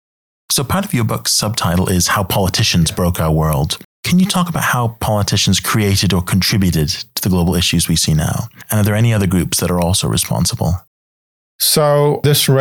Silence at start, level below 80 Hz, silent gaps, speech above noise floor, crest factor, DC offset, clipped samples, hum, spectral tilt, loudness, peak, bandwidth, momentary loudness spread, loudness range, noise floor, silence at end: 0.5 s; -36 dBFS; 3.85-4.03 s, 10.87-11.59 s; over 76 dB; 14 dB; under 0.1%; under 0.1%; none; -4.5 dB/octave; -15 LUFS; -2 dBFS; 19.5 kHz; 5 LU; 1 LU; under -90 dBFS; 0 s